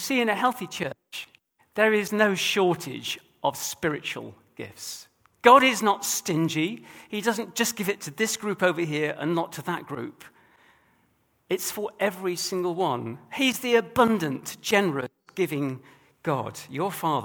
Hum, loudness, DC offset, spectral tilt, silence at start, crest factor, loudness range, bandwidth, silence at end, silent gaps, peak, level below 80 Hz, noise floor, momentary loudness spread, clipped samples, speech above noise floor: none; -25 LUFS; under 0.1%; -3.5 dB/octave; 0 s; 26 dB; 7 LU; over 20 kHz; 0 s; none; -2 dBFS; -68 dBFS; -67 dBFS; 15 LU; under 0.1%; 42 dB